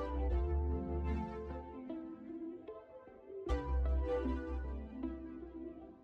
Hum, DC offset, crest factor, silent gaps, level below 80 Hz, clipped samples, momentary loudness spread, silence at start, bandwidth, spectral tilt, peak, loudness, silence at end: none; under 0.1%; 14 dB; none; -40 dBFS; under 0.1%; 14 LU; 0 s; 4.7 kHz; -9.5 dB/octave; -26 dBFS; -41 LUFS; 0 s